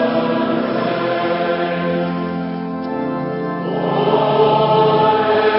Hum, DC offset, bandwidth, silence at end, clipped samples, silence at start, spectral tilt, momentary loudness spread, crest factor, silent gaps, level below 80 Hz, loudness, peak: none; under 0.1%; 5.8 kHz; 0 s; under 0.1%; 0 s; -11.5 dB/octave; 9 LU; 14 dB; none; -56 dBFS; -17 LUFS; -2 dBFS